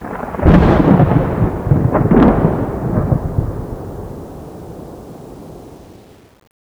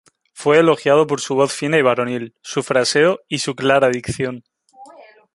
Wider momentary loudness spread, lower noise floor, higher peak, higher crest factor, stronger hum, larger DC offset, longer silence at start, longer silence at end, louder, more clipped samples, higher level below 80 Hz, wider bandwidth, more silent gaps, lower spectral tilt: first, 23 LU vs 11 LU; about the same, -42 dBFS vs -45 dBFS; about the same, 0 dBFS vs 0 dBFS; about the same, 16 dB vs 18 dB; neither; neither; second, 0 s vs 0.35 s; first, 0.85 s vs 0.5 s; first, -14 LUFS vs -17 LUFS; neither; first, -26 dBFS vs -54 dBFS; first, 15 kHz vs 11.5 kHz; neither; first, -9.5 dB/octave vs -4.5 dB/octave